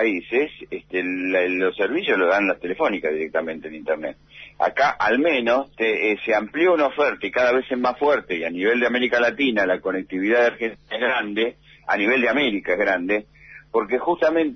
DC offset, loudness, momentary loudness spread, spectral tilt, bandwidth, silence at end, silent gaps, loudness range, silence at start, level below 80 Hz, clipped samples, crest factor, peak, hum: under 0.1%; -21 LUFS; 8 LU; -5 dB/octave; 6.4 kHz; 0 s; none; 2 LU; 0 s; -58 dBFS; under 0.1%; 14 dB; -8 dBFS; none